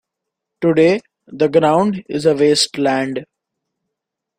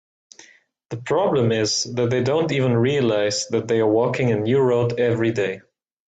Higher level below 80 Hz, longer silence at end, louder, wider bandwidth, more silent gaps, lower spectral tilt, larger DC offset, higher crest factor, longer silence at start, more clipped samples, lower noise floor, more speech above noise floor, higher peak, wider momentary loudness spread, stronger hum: about the same, -58 dBFS vs -58 dBFS; first, 1.15 s vs 0.5 s; first, -16 LUFS vs -20 LUFS; first, 15.5 kHz vs 9 kHz; neither; about the same, -4.5 dB/octave vs -5 dB/octave; neither; about the same, 16 dB vs 14 dB; second, 0.6 s vs 0.9 s; neither; first, -81 dBFS vs -53 dBFS; first, 66 dB vs 34 dB; first, 0 dBFS vs -8 dBFS; first, 8 LU vs 5 LU; neither